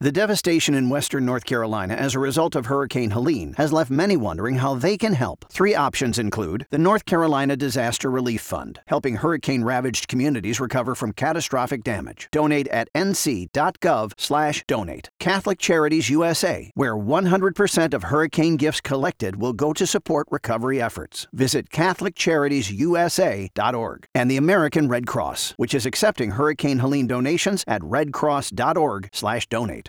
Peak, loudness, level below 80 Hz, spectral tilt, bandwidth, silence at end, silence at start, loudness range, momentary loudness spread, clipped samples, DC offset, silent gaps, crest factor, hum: -4 dBFS; -22 LUFS; -50 dBFS; -5 dB/octave; 19.5 kHz; 0 s; 0 s; 2 LU; 6 LU; under 0.1%; under 0.1%; none; 18 dB; none